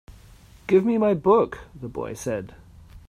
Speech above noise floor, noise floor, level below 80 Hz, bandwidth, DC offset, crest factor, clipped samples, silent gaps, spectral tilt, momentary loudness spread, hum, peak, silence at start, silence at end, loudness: 27 dB; -49 dBFS; -50 dBFS; 14 kHz; under 0.1%; 18 dB; under 0.1%; none; -7 dB/octave; 18 LU; none; -6 dBFS; 0.1 s; 0.1 s; -23 LUFS